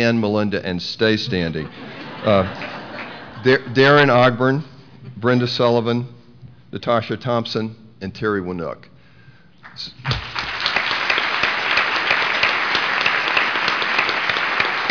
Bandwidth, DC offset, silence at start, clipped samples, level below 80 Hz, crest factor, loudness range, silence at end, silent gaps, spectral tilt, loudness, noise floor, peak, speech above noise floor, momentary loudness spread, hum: 5.4 kHz; 0.3%; 0 s; under 0.1%; -50 dBFS; 16 dB; 8 LU; 0 s; none; -5.5 dB/octave; -18 LUFS; -49 dBFS; -4 dBFS; 30 dB; 16 LU; none